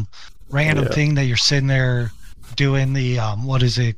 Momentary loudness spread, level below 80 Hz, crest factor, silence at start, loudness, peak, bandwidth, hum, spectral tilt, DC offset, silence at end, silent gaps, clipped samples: 9 LU; -36 dBFS; 16 dB; 0 s; -19 LUFS; -4 dBFS; 11 kHz; none; -5 dB/octave; 1%; 0.05 s; none; under 0.1%